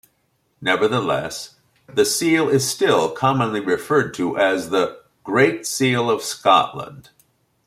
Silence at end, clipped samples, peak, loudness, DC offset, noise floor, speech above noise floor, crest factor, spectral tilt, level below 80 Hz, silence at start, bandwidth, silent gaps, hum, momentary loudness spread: 0.65 s; under 0.1%; -2 dBFS; -19 LUFS; under 0.1%; -66 dBFS; 47 dB; 18 dB; -4 dB/octave; -60 dBFS; 0.6 s; 16 kHz; none; none; 10 LU